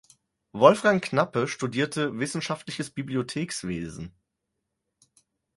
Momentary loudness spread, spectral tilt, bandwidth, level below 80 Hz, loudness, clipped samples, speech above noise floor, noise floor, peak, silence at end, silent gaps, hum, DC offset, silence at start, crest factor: 15 LU; -5 dB/octave; 11.5 kHz; -60 dBFS; -26 LUFS; under 0.1%; 56 dB; -82 dBFS; -2 dBFS; 1.5 s; none; none; under 0.1%; 0.55 s; 26 dB